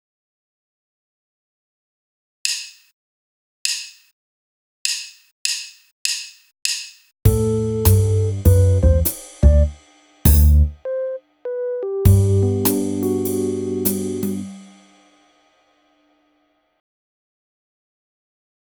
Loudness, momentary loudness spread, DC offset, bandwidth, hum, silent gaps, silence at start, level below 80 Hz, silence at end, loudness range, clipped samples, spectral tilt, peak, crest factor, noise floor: -19 LUFS; 12 LU; under 0.1%; over 20 kHz; none; 2.93-3.65 s, 4.13-4.85 s, 5.32-5.45 s, 5.92-6.05 s; 2.45 s; -26 dBFS; 4.15 s; 12 LU; under 0.1%; -5.5 dB/octave; 0 dBFS; 20 dB; -64 dBFS